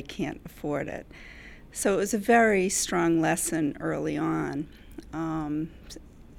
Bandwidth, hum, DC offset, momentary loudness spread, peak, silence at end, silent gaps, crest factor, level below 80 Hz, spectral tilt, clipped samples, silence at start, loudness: over 20 kHz; none; under 0.1%; 23 LU; -10 dBFS; 0 s; none; 18 dB; -50 dBFS; -4.5 dB/octave; under 0.1%; 0 s; -27 LUFS